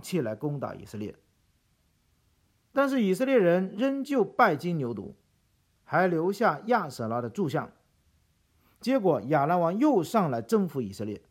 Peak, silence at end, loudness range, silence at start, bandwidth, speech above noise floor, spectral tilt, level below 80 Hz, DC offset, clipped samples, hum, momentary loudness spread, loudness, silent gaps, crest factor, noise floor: -8 dBFS; 0.1 s; 3 LU; 0.05 s; 16.5 kHz; 43 dB; -7 dB/octave; -70 dBFS; under 0.1%; under 0.1%; none; 13 LU; -27 LUFS; none; 20 dB; -69 dBFS